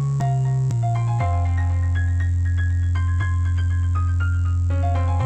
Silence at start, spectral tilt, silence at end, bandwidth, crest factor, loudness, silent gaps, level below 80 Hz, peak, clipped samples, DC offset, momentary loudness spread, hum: 0 s; -8 dB/octave; 0 s; 8.4 kHz; 8 dB; -21 LUFS; none; -30 dBFS; -12 dBFS; under 0.1%; under 0.1%; 1 LU; none